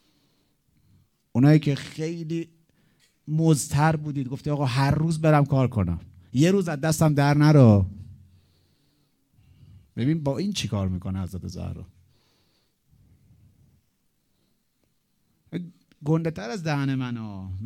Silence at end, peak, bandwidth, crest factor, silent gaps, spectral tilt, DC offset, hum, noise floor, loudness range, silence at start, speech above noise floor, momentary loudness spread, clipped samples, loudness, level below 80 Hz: 0 s; -4 dBFS; 14.5 kHz; 20 dB; none; -7 dB/octave; under 0.1%; none; -71 dBFS; 14 LU; 1.35 s; 49 dB; 17 LU; under 0.1%; -23 LUFS; -52 dBFS